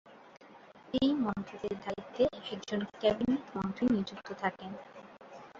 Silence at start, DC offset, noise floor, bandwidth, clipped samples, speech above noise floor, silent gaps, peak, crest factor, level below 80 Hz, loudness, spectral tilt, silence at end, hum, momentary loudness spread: 0.05 s; under 0.1%; -55 dBFS; 7.4 kHz; under 0.1%; 22 dB; none; -16 dBFS; 20 dB; -62 dBFS; -34 LUFS; -6.5 dB/octave; 0 s; none; 16 LU